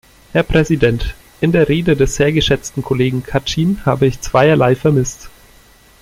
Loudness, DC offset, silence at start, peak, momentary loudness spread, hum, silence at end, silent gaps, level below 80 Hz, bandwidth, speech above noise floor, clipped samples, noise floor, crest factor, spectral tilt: -15 LUFS; under 0.1%; 0.35 s; 0 dBFS; 7 LU; none; 0.75 s; none; -30 dBFS; 16 kHz; 32 dB; under 0.1%; -46 dBFS; 14 dB; -6 dB/octave